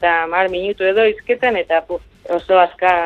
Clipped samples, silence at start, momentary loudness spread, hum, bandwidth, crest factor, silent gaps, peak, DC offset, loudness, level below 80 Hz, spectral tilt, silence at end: under 0.1%; 0 s; 9 LU; none; 6.8 kHz; 16 dB; none; 0 dBFS; under 0.1%; -16 LUFS; -48 dBFS; -5.5 dB/octave; 0 s